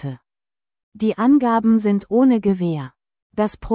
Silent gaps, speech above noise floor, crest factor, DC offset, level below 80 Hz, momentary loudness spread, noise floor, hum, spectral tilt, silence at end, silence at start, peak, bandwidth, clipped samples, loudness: 0.83-0.92 s, 3.22-3.30 s; over 73 dB; 14 dB; under 0.1%; -48 dBFS; 14 LU; under -90 dBFS; none; -12 dB/octave; 0 s; 0.05 s; -6 dBFS; 4 kHz; under 0.1%; -18 LUFS